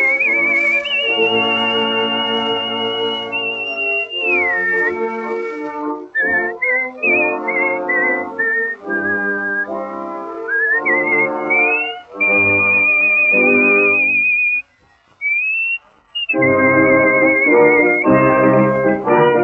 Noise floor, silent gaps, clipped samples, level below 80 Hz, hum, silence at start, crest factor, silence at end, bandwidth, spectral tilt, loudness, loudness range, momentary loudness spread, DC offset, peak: -54 dBFS; none; under 0.1%; -54 dBFS; none; 0 s; 14 dB; 0 s; 7.8 kHz; -2 dB/octave; -14 LUFS; 6 LU; 11 LU; under 0.1%; 0 dBFS